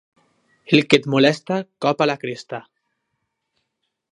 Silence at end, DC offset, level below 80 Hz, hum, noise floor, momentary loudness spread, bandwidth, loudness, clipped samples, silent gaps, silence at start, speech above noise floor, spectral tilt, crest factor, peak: 1.5 s; under 0.1%; -68 dBFS; none; -76 dBFS; 16 LU; 11 kHz; -19 LUFS; under 0.1%; none; 0.7 s; 57 dB; -5.5 dB/octave; 22 dB; 0 dBFS